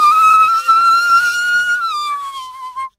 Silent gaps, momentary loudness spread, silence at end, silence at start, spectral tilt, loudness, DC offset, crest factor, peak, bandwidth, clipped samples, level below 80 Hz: none; 18 LU; 0.1 s; 0 s; 1.5 dB/octave; -11 LUFS; under 0.1%; 12 dB; -2 dBFS; 16 kHz; under 0.1%; -60 dBFS